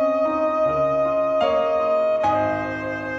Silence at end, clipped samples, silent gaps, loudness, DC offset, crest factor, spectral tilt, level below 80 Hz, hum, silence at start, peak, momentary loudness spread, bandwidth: 0 s; under 0.1%; none; -21 LUFS; under 0.1%; 12 dB; -6.5 dB/octave; -52 dBFS; none; 0 s; -8 dBFS; 4 LU; 7.2 kHz